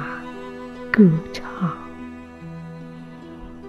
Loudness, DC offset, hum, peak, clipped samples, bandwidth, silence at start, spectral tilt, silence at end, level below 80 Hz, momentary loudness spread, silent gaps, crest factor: -20 LUFS; under 0.1%; none; -2 dBFS; under 0.1%; 7.6 kHz; 0 s; -8 dB/octave; 0 s; -50 dBFS; 23 LU; none; 22 dB